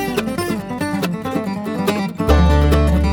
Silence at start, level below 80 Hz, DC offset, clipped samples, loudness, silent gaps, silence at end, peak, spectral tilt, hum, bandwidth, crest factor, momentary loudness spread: 0 s; -20 dBFS; under 0.1%; under 0.1%; -18 LUFS; none; 0 s; -2 dBFS; -6.5 dB/octave; none; 18 kHz; 16 dB; 9 LU